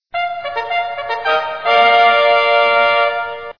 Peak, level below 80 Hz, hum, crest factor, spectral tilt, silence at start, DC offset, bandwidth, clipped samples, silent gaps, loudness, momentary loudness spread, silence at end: 0 dBFS; -58 dBFS; none; 14 dB; -2.5 dB/octave; 0.15 s; 0.5%; 5.4 kHz; under 0.1%; none; -14 LUFS; 11 LU; 0.05 s